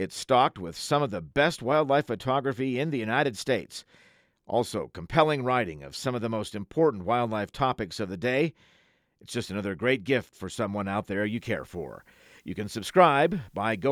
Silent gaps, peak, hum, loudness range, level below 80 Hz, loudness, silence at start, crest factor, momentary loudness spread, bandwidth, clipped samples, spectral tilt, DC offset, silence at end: none; -6 dBFS; none; 4 LU; -58 dBFS; -27 LUFS; 0 s; 22 dB; 11 LU; 16 kHz; under 0.1%; -5.5 dB/octave; under 0.1%; 0 s